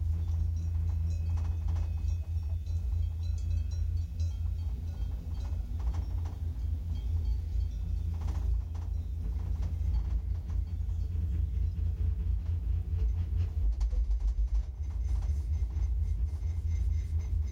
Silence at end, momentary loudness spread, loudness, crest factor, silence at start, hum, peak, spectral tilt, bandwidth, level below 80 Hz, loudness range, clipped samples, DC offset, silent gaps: 0 s; 4 LU; -34 LUFS; 10 dB; 0 s; none; -22 dBFS; -8 dB/octave; 7 kHz; -34 dBFS; 2 LU; under 0.1%; under 0.1%; none